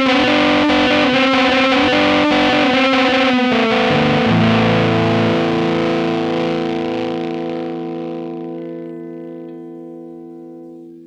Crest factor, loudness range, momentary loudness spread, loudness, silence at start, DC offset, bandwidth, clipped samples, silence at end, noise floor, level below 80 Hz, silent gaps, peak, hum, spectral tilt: 14 dB; 14 LU; 20 LU; -14 LUFS; 0 s; under 0.1%; 9.6 kHz; under 0.1%; 0 s; -36 dBFS; -46 dBFS; none; -2 dBFS; none; -6 dB/octave